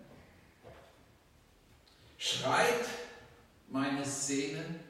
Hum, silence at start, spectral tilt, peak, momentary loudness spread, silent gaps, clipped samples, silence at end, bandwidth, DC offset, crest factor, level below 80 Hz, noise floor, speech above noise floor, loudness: none; 0 s; -3 dB/octave; -16 dBFS; 23 LU; none; under 0.1%; 0 s; 16 kHz; under 0.1%; 20 dB; -70 dBFS; -64 dBFS; 31 dB; -33 LUFS